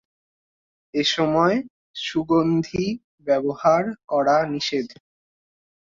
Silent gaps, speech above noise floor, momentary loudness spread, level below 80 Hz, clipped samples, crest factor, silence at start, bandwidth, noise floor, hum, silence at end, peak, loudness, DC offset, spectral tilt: 1.70-1.94 s, 3.04-3.18 s; over 69 dB; 10 LU; -56 dBFS; under 0.1%; 18 dB; 0.95 s; 7.6 kHz; under -90 dBFS; none; 1.05 s; -6 dBFS; -22 LUFS; under 0.1%; -5.5 dB/octave